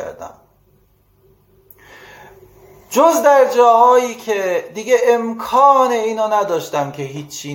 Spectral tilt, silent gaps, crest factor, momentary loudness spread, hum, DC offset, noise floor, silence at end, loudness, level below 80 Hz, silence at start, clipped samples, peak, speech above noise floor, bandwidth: -4 dB/octave; none; 16 dB; 15 LU; none; under 0.1%; -55 dBFS; 0 s; -14 LUFS; -60 dBFS; 0 s; under 0.1%; 0 dBFS; 41 dB; 17 kHz